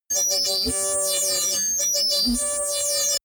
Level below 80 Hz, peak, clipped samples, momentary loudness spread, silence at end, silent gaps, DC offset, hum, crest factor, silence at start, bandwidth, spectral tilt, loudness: -46 dBFS; -14 dBFS; under 0.1%; 3 LU; 0.05 s; none; under 0.1%; none; 10 dB; 0.1 s; over 20 kHz; 0 dB/octave; -20 LUFS